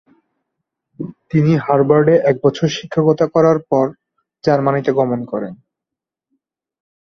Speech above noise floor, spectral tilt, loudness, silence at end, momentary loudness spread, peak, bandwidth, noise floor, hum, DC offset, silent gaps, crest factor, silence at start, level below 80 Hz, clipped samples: 70 dB; -7.5 dB/octave; -15 LUFS; 1.45 s; 13 LU; 0 dBFS; 7 kHz; -85 dBFS; none; under 0.1%; none; 16 dB; 1 s; -56 dBFS; under 0.1%